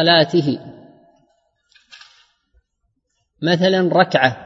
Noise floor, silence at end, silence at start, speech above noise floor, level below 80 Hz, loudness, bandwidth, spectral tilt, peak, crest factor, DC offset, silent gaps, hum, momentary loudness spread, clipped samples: -71 dBFS; 0 s; 0 s; 55 dB; -64 dBFS; -16 LUFS; 7.6 kHz; -6 dB/octave; 0 dBFS; 20 dB; under 0.1%; none; none; 11 LU; under 0.1%